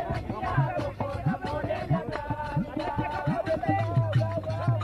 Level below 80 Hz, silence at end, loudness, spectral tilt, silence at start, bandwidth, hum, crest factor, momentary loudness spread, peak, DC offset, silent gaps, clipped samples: -46 dBFS; 0 s; -29 LUFS; -8.5 dB/octave; 0 s; 10.5 kHz; none; 16 dB; 5 LU; -12 dBFS; under 0.1%; none; under 0.1%